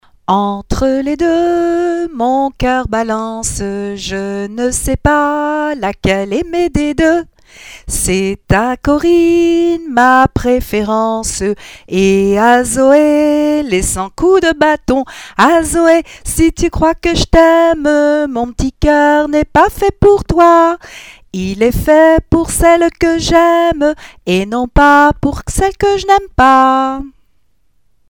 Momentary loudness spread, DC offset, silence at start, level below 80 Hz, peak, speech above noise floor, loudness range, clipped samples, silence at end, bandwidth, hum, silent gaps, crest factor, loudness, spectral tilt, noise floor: 10 LU; 0.3%; 0.3 s; -26 dBFS; 0 dBFS; 48 dB; 5 LU; 0.2%; 1 s; 18.5 kHz; none; none; 12 dB; -12 LUFS; -5 dB/octave; -60 dBFS